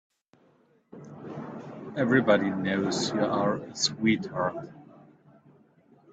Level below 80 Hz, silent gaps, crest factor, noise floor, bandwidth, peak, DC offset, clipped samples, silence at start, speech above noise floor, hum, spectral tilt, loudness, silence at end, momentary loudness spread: -68 dBFS; none; 20 dB; -64 dBFS; 9 kHz; -8 dBFS; under 0.1%; under 0.1%; 0.95 s; 37 dB; none; -4.5 dB/octave; -27 LUFS; 1.3 s; 18 LU